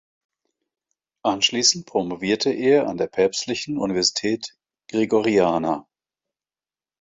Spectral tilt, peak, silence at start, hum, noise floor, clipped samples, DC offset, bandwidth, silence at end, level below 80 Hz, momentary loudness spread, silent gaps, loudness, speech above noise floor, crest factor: -3 dB/octave; -4 dBFS; 1.25 s; none; under -90 dBFS; under 0.1%; under 0.1%; 8 kHz; 1.2 s; -60 dBFS; 9 LU; none; -21 LUFS; over 69 dB; 20 dB